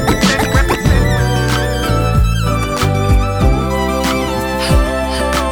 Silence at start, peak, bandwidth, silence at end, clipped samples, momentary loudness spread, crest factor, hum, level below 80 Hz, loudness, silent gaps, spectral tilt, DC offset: 0 s; 0 dBFS; 20 kHz; 0 s; under 0.1%; 3 LU; 12 dB; none; -18 dBFS; -14 LUFS; none; -5.5 dB/octave; under 0.1%